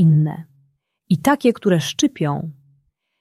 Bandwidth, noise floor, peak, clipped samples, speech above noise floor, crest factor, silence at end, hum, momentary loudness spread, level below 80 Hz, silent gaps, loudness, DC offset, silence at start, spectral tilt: 14.5 kHz; -63 dBFS; -4 dBFS; under 0.1%; 45 dB; 16 dB; 0.7 s; none; 12 LU; -58 dBFS; none; -19 LUFS; under 0.1%; 0 s; -6 dB/octave